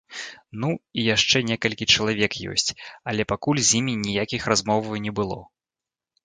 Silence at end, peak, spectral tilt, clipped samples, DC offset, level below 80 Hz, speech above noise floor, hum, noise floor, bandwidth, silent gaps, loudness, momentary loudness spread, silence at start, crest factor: 0.8 s; -4 dBFS; -3 dB/octave; under 0.1%; under 0.1%; -52 dBFS; 66 dB; none; -90 dBFS; 9.6 kHz; none; -22 LUFS; 11 LU; 0.1 s; 20 dB